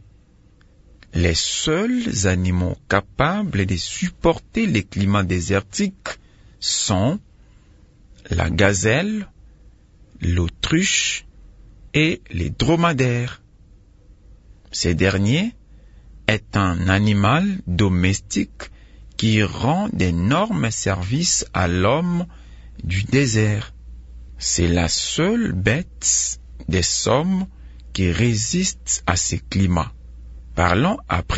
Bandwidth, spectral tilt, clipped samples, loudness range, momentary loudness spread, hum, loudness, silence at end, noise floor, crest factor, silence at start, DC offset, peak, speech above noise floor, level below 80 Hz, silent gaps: 8 kHz; -4.5 dB/octave; under 0.1%; 3 LU; 9 LU; none; -20 LUFS; 0 s; -52 dBFS; 20 dB; 1.15 s; under 0.1%; -2 dBFS; 32 dB; -40 dBFS; none